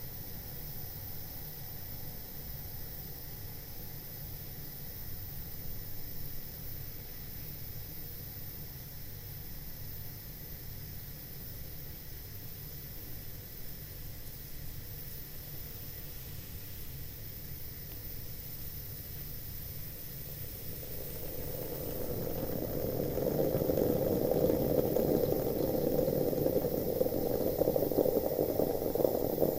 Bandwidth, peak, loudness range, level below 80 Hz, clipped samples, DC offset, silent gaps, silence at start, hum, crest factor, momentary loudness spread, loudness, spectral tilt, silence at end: 16 kHz; -12 dBFS; 13 LU; -48 dBFS; under 0.1%; under 0.1%; none; 0 s; none; 24 dB; 13 LU; -37 LUFS; -6 dB/octave; 0 s